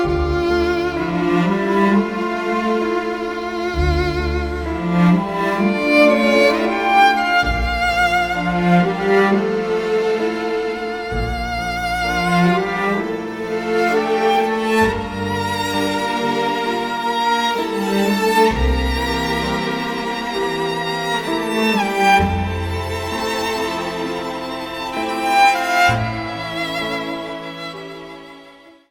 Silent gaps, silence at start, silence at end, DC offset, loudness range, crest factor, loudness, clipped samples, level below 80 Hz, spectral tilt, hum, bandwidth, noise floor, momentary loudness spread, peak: none; 0 s; 0.2 s; under 0.1%; 5 LU; 16 dB; -18 LUFS; under 0.1%; -32 dBFS; -5.5 dB/octave; none; 19 kHz; -44 dBFS; 9 LU; -2 dBFS